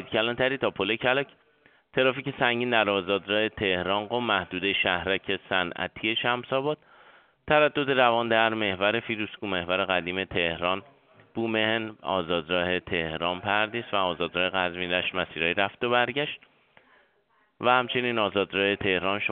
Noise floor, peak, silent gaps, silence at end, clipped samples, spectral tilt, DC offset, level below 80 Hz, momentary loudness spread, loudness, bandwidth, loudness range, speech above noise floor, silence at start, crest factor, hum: -68 dBFS; -6 dBFS; none; 0 s; under 0.1%; -2 dB/octave; under 0.1%; -60 dBFS; 7 LU; -26 LUFS; 4.7 kHz; 3 LU; 41 dB; 0 s; 22 dB; none